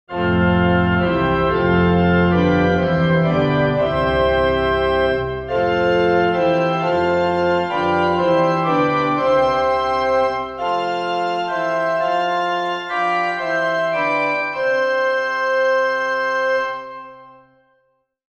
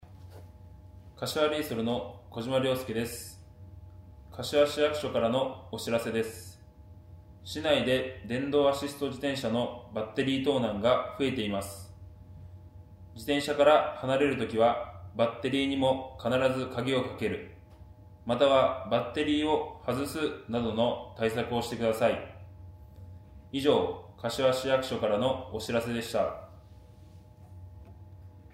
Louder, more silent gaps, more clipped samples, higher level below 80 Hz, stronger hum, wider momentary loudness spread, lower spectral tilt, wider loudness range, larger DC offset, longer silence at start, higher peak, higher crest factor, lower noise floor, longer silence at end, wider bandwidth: first, -18 LUFS vs -29 LUFS; neither; neither; first, -40 dBFS vs -56 dBFS; neither; second, 5 LU vs 23 LU; first, -7 dB/octave vs -5 dB/octave; about the same, 4 LU vs 4 LU; neither; about the same, 0.1 s vs 0.05 s; first, -4 dBFS vs -10 dBFS; second, 14 dB vs 20 dB; first, -65 dBFS vs -52 dBFS; first, 1.1 s vs 0.1 s; second, 8.4 kHz vs 16 kHz